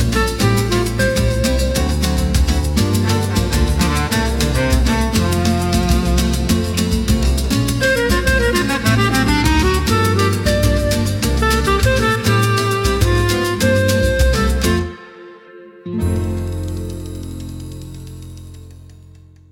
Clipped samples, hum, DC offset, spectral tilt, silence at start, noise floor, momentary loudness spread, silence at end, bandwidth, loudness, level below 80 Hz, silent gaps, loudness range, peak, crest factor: under 0.1%; none; under 0.1%; -5 dB/octave; 0 s; -42 dBFS; 13 LU; 0.65 s; 17 kHz; -16 LUFS; -22 dBFS; none; 10 LU; -2 dBFS; 14 dB